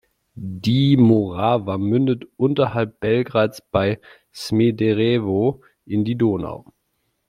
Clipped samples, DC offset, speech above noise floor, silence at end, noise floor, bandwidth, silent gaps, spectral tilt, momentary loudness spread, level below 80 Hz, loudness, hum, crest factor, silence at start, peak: under 0.1%; under 0.1%; 52 dB; 0.7 s; -71 dBFS; 14 kHz; none; -8 dB/octave; 14 LU; -54 dBFS; -20 LUFS; none; 18 dB; 0.35 s; -2 dBFS